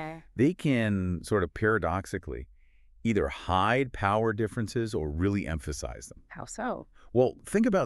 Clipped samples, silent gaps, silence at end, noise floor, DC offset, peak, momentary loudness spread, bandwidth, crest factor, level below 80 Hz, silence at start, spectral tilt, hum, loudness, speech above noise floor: under 0.1%; none; 0 s; -57 dBFS; under 0.1%; -12 dBFS; 14 LU; 13 kHz; 18 dB; -46 dBFS; 0 s; -6.5 dB/octave; none; -29 LUFS; 29 dB